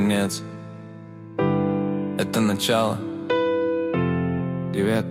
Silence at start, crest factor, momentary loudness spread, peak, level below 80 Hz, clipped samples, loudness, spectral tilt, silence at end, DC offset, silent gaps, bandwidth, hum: 0 s; 16 dB; 16 LU; -8 dBFS; -54 dBFS; under 0.1%; -24 LUFS; -5.5 dB/octave; 0 s; under 0.1%; none; 16 kHz; none